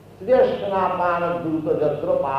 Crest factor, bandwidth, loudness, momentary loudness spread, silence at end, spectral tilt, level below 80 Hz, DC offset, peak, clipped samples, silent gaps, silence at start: 14 dB; 6 kHz; -21 LUFS; 5 LU; 0 s; -8 dB/octave; -52 dBFS; under 0.1%; -8 dBFS; under 0.1%; none; 0.1 s